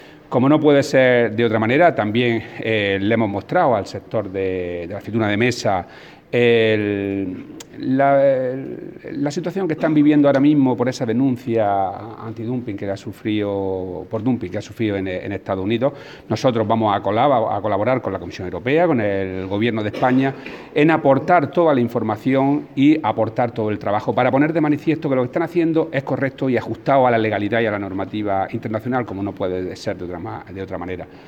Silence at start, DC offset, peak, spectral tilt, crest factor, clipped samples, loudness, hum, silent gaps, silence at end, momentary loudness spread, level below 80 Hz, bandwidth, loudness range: 0 s; under 0.1%; -2 dBFS; -7 dB/octave; 18 dB; under 0.1%; -19 LUFS; none; none; 0 s; 12 LU; -56 dBFS; 9 kHz; 6 LU